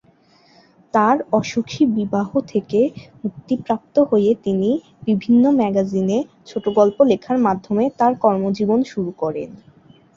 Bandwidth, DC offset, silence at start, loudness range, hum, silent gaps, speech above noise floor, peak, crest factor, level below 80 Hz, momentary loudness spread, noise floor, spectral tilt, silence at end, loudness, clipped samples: 7.4 kHz; under 0.1%; 0.95 s; 2 LU; none; none; 36 dB; -2 dBFS; 16 dB; -58 dBFS; 10 LU; -54 dBFS; -7.5 dB/octave; 0.6 s; -19 LUFS; under 0.1%